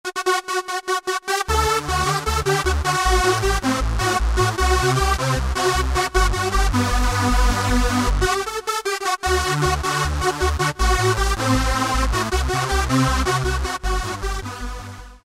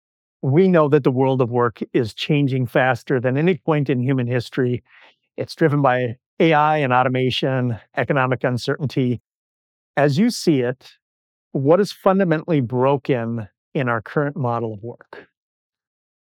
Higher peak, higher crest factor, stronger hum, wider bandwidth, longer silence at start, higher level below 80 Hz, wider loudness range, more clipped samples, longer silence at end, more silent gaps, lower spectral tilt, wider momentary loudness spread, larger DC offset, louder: about the same, -4 dBFS vs -2 dBFS; about the same, 16 dB vs 16 dB; neither; first, 16 kHz vs 14 kHz; second, 0.05 s vs 0.45 s; first, -24 dBFS vs -64 dBFS; second, 1 LU vs 4 LU; neither; second, 0.05 s vs 1.15 s; second, none vs 6.26-6.37 s, 9.20-9.94 s, 11.02-11.51 s, 13.57-13.72 s; second, -4 dB/octave vs -7 dB/octave; second, 6 LU vs 11 LU; neither; about the same, -20 LUFS vs -20 LUFS